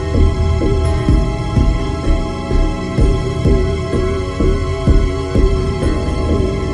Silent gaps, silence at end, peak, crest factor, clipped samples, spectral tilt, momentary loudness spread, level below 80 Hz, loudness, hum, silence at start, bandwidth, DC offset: none; 0 s; 0 dBFS; 14 dB; under 0.1%; -7.5 dB/octave; 4 LU; -16 dBFS; -17 LUFS; none; 0 s; 11 kHz; under 0.1%